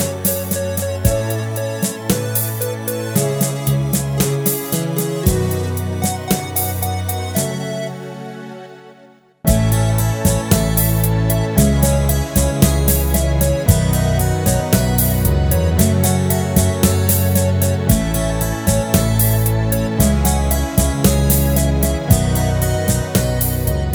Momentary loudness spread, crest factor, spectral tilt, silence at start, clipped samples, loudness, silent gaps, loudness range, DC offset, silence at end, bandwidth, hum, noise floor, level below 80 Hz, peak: 6 LU; 16 dB; -5.5 dB/octave; 0 s; under 0.1%; -17 LUFS; none; 5 LU; under 0.1%; 0 s; over 20 kHz; none; -47 dBFS; -24 dBFS; 0 dBFS